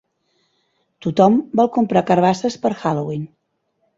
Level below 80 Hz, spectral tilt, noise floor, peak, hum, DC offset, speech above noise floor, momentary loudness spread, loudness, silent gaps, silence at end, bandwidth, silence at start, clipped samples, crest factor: -60 dBFS; -7 dB/octave; -69 dBFS; -2 dBFS; none; under 0.1%; 52 dB; 13 LU; -18 LUFS; none; 0.7 s; 7.8 kHz; 1.05 s; under 0.1%; 18 dB